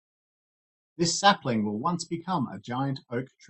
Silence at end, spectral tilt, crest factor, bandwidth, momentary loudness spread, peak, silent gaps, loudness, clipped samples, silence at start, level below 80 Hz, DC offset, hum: 0.25 s; -4 dB/octave; 22 dB; 8.8 kHz; 10 LU; -6 dBFS; none; -27 LUFS; under 0.1%; 1 s; -68 dBFS; under 0.1%; none